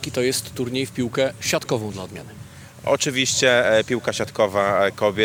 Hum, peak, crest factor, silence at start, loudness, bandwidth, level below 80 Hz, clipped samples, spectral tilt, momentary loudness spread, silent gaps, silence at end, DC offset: none; -4 dBFS; 18 dB; 0 s; -21 LUFS; 19 kHz; -54 dBFS; under 0.1%; -3.5 dB/octave; 17 LU; none; 0 s; under 0.1%